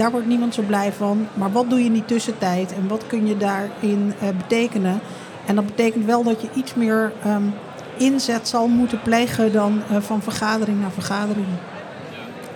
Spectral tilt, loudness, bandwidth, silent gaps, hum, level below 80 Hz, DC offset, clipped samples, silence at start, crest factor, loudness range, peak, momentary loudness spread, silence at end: -5.5 dB/octave; -21 LUFS; 18 kHz; none; none; -62 dBFS; under 0.1%; under 0.1%; 0 s; 14 dB; 2 LU; -6 dBFS; 9 LU; 0 s